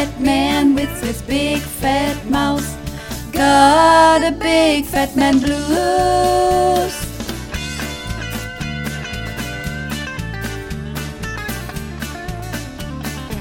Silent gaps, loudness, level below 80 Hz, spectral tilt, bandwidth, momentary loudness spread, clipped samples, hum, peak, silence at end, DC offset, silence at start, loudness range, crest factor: none; -17 LUFS; -32 dBFS; -4.5 dB/octave; 17.5 kHz; 15 LU; under 0.1%; none; 0 dBFS; 0 s; under 0.1%; 0 s; 12 LU; 18 dB